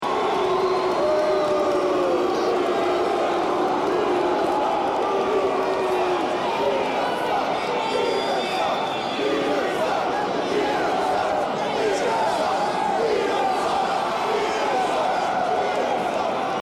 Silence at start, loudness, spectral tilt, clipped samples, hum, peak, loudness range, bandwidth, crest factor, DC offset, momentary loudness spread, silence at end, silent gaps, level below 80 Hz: 0 s; -22 LUFS; -4 dB/octave; under 0.1%; none; -12 dBFS; 2 LU; 15 kHz; 10 dB; under 0.1%; 2 LU; 0 s; none; -56 dBFS